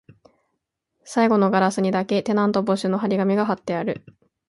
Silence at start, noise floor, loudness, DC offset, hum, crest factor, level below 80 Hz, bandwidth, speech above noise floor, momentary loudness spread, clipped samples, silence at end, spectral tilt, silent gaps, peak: 1.05 s; -77 dBFS; -21 LUFS; under 0.1%; none; 16 dB; -64 dBFS; 11.5 kHz; 56 dB; 8 LU; under 0.1%; 0.5 s; -6.5 dB/octave; none; -6 dBFS